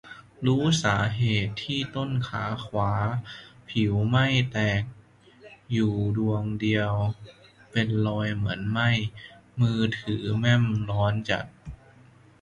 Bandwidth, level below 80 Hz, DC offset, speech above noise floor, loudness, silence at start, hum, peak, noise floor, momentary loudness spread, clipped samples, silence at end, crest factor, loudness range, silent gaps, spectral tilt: 10.5 kHz; -50 dBFS; under 0.1%; 29 dB; -26 LUFS; 0.05 s; none; -8 dBFS; -54 dBFS; 11 LU; under 0.1%; 0.65 s; 18 dB; 2 LU; none; -6 dB/octave